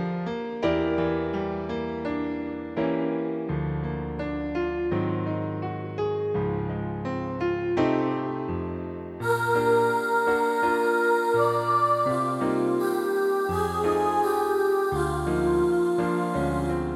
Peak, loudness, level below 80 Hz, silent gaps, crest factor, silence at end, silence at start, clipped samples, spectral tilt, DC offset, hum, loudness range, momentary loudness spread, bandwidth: -10 dBFS; -26 LUFS; -46 dBFS; none; 14 dB; 0 s; 0 s; under 0.1%; -7 dB/octave; under 0.1%; none; 6 LU; 8 LU; 15 kHz